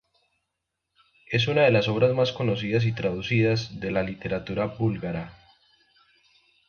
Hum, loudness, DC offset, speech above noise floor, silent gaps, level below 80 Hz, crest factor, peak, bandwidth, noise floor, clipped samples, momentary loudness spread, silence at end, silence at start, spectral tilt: none; -25 LUFS; under 0.1%; 58 dB; none; -54 dBFS; 18 dB; -8 dBFS; 6.8 kHz; -82 dBFS; under 0.1%; 10 LU; 1.4 s; 1.3 s; -7 dB/octave